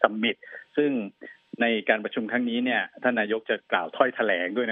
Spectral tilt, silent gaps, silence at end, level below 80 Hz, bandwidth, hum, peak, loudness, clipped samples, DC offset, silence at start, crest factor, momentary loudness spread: -8 dB/octave; none; 0 s; -80 dBFS; 3.9 kHz; none; -2 dBFS; -26 LUFS; under 0.1%; under 0.1%; 0 s; 24 dB; 7 LU